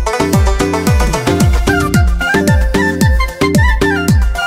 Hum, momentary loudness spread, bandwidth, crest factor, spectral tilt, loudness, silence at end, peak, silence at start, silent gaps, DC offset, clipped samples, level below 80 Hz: none; 2 LU; 16 kHz; 10 dB; -5.5 dB/octave; -12 LUFS; 0 s; 0 dBFS; 0 s; none; under 0.1%; under 0.1%; -16 dBFS